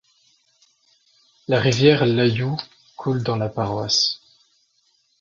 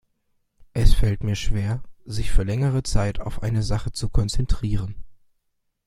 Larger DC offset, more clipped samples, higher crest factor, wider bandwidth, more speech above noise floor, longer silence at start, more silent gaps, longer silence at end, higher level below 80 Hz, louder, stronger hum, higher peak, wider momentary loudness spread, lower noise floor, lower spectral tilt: neither; neither; about the same, 22 dB vs 18 dB; second, 7.6 kHz vs 12 kHz; second, 45 dB vs 52 dB; first, 1.5 s vs 0.75 s; neither; first, 1.05 s vs 0.75 s; second, -56 dBFS vs -26 dBFS; first, -20 LUFS vs -25 LUFS; neither; about the same, -2 dBFS vs -2 dBFS; first, 15 LU vs 9 LU; second, -65 dBFS vs -72 dBFS; about the same, -5 dB/octave vs -6 dB/octave